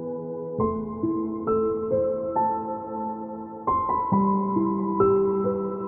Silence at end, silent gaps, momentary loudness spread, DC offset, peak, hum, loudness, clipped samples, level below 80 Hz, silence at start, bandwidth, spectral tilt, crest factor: 0 s; none; 10 LU; under 0.1%; -10 dBFS; none; -25 LUFS; under 0.1%; -52 dBFS; 0 s; 2.8 kHz; -14.5 dB/octave; 16 dB